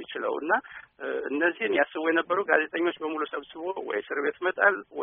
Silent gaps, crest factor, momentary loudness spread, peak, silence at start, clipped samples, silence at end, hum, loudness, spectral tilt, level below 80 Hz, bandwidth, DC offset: none; 22 dB; 10 LU; -6 dBFS; 0 s; under 0.1%; 0 s; none; -27 LUFS; 3.5 dB/octave; -74 dBFS; 3.8 kHz; under 0.1%